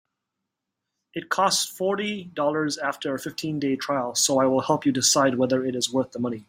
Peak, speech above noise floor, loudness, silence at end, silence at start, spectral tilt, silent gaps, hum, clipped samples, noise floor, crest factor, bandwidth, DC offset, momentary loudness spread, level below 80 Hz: -6 dBFS; 59 dB; -23 LUFS; 0.05 s; 1.15 s; -3 dB/octave; none; none; under 0.1%; -83 dBFS; 18 dB; 16 kHz; under 0.1%; 10 LU; -68 dBFS